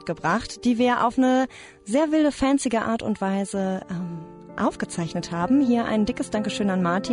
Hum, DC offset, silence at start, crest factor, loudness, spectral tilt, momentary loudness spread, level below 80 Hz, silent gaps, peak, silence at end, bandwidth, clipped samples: none; under 0.1%; 0 s; 14 dB; -23 LUFS; -5.5 dB/octave; 10 LU; -50 dBFS; none; -10 dBFS; 0 s; 11 kHz; under 0.1%